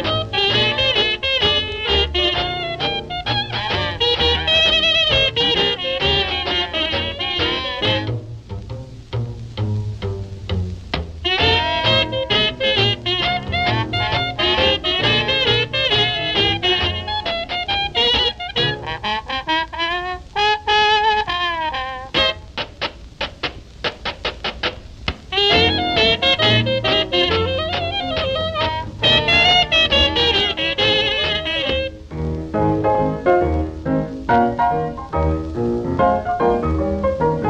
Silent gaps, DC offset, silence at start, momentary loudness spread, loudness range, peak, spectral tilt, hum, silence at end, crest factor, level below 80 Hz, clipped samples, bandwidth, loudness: none; under 0.1%; 0 s; 12 LU; 7 LU; -4 dBFS; -5 dB/octave; none; 0 s; 16 dB; -34 dBFS; under 0.1%; 9.4 kHz; -17 LUFS